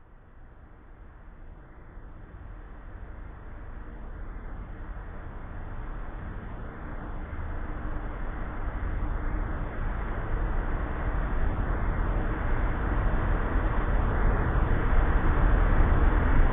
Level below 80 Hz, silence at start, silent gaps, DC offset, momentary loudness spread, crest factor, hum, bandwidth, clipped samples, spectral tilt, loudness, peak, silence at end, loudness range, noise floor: -28 dBFS; 0.1 s; none; under 0.1%; 21 LU; 18 dB; none; 3.7 kHz; under 0.1%; -11 dB/octave; -31 LUFS; -10 dBFS; 0 s; 18 LU; -49 dBFS